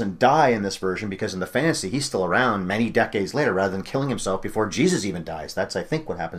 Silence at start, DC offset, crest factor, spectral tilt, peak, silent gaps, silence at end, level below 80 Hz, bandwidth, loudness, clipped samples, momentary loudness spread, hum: 0 s; under 0.1%; 20 dB; -5 dB/octave; -4 dBFS; none; 0 s; -50 dBFS; 15.5 kHz; -23 LUFS; under 0.1%; 9 LU; none